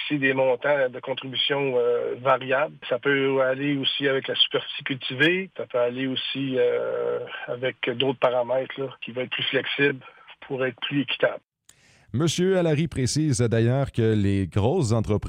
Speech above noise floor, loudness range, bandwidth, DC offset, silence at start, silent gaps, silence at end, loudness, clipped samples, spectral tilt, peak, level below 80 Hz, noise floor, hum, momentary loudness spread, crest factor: 34 dB; 3 LU; 13 kHz; under 0.1%; 0 s; none; 0 s; -24 LUFS; under 0.1%; -5 dB/octave; -8 dBFS; -54 dBFS; -58 dBFS; none; 8 LU; 16 dB